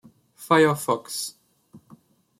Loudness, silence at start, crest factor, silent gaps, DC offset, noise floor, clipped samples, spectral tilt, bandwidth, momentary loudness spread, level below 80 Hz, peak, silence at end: -23 LUFS; 0.4 s; 20 dB; none; under 0.1%; -54 dBFS; under 0.1%; -4.5 dB/octave; 16 kHz; 15 LU; -68 dBFS; -6 dBFS; 0.6 s